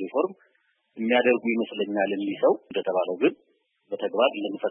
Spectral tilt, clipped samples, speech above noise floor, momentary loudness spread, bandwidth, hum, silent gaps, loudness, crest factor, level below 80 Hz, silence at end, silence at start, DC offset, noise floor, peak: -9 dB/octave; under 0.1%; 44 dB; 8 LU; 3.7 kHz; none; none; -25 LUFS; 18 dB; -82 dBFS; 0 s; 0 s; under 0.1%; -69 dBFS; -8 dBFS